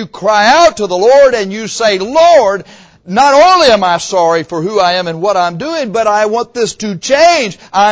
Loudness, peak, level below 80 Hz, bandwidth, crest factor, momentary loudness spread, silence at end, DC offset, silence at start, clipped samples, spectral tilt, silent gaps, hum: -10 LUFS; 0 dBFS; -46 dBFS; 8 kHz; 10 dB; 10 LU; 0 s; under 0.1%; 0 s; under 0.1%; -3.5 dB/octave; none; none